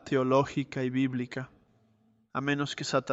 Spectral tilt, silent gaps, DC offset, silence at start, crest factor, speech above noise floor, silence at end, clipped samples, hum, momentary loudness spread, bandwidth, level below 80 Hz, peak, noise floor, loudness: -5.5 dB/octave; none; under 0.1%; 0.05 s; 18 dB; 38 dB; 0 s; under 0.1%; none; 12 LU; 8 kHz; -66 dBFS; -12 dBFS; -67 dBFS; -30 LUFS